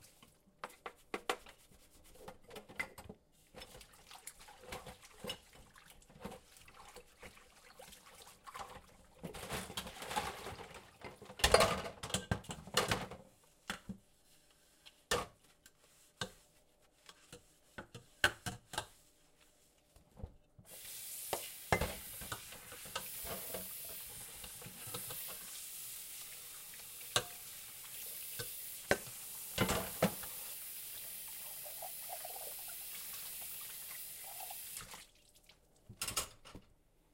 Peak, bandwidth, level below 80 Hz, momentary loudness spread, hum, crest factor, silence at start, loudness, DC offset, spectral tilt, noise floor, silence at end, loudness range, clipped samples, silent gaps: -10 dBFS; 16.5 kHz; -60 dBFS; 20 LU; none; 34 dB; 0 s; -41 LUFS; under 0.1%; -2.5 dB/octave; -70 dBFS; 0.5 s; 15 LU; under 0.1%; none